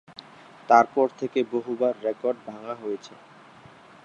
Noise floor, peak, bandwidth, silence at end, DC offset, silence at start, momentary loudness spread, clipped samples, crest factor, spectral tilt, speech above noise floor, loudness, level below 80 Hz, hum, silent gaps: -50 dBFS; -4 dBFS; 8.2 kHz; 1 s; under 0.1%; 0.7 s; 26 LU; under 0.1%; 22 dB; -5.5 dB/octave; 25 dB; -25 LUFS; -76 dBFS; none; none